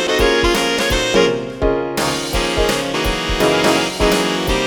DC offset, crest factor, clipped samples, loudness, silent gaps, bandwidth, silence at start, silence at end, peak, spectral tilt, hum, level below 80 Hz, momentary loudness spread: under 0.1%; 16 dB; under 0.1%; -16 LUFS; none; 19 kHz; 0 s; 0 s; 0 dBFS; -3.5 dB/octave; none; -28 dBFS; 5 LU